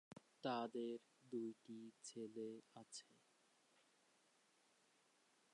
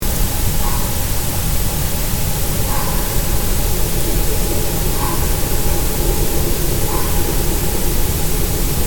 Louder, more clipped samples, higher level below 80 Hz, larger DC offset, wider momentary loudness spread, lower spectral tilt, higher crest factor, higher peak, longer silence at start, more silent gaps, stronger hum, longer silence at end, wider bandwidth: second, -52 LUFS vs -18 LUFS; neither; second, under -90 dBFS vs -20 dBFS; second, under 0.1% vs 6%; first, 12 LU vs 1 LU; about the same, -4.5 dB/octave vs -4 dB/octave; first, 20 dB vs 12 dB; second, -34 dBFS vs -4 dBFS; about the same, 0.1 s vs 0 s; neither; neither; first, 2.4 s vs 0 s; second, 11 kHz vs 18 kHz